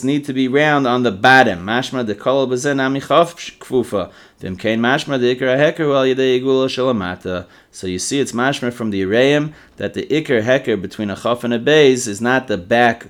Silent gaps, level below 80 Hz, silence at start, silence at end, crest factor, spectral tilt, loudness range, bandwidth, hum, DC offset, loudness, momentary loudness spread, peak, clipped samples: none; -56 dBFS; 0 s; 0.05 s; 16 dB; -4.5 dB/octave; 4 LU; 15.5 kHz; none; under 0.1%; -16 LUFS; 12 LU; 0 dBFS; under 0.1%